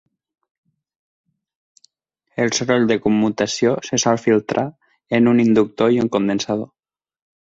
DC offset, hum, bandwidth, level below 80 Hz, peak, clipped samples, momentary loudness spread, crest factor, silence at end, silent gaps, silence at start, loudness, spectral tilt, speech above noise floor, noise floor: under 0.1%; none; 8 kHz; -58 dBFS; -2 dBFS; under 0.1%; 9 LU; 18 dB; 0.9 s; none; 2.4 s; -18 LUFS; -5 dB/octave; 54 dB; -71 dBFS